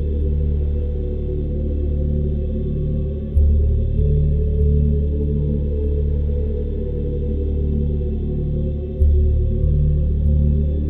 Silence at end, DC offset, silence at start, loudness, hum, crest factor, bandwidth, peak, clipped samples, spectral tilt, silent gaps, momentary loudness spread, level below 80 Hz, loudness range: 0 s; under 0.1%; 0 s; -21 LUFS; none; 14 dB; 1.1 kHz; -4 dBFS; under 0.1%; -12.5 dB/octave; none; 6 LU; -20 dBFS; 3 LU